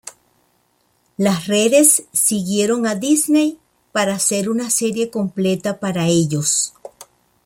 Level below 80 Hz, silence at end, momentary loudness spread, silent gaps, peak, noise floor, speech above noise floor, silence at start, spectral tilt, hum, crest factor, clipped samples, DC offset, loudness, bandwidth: -60 dBFS; 0.45 s; 10 LU; none; 0 dBFS; -62 dBFS; 45 dB; 0.05 s; -4 dB/octave; none; 18 dB; under 0.1%; under 0.1%; -17 LUFS; 16.5 kHz